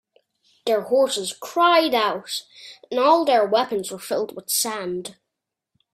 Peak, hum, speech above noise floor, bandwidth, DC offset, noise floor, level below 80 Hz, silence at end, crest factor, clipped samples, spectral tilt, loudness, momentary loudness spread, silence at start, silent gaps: -4 dBFS; none; 62 dB; 16 kHz; under 0.1%; -83 dBFS; -72 dBFS; 0.8 s; 18 dB; under 0.1%; -2 dB/octave; -21 LUFS; 14 LU; 0.65 s; none